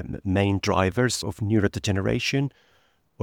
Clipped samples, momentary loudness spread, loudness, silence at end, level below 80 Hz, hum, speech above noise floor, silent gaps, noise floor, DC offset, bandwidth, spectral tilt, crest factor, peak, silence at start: under 0.1%; 5 LU; -24 LUFS; 0 s; -48 dBFS; none; 40 dB; none; -64 dBFS; under 0.1%; 16.5 kHz; -5.5 dB/octave; 20 dB; -6 dBFS; 0 s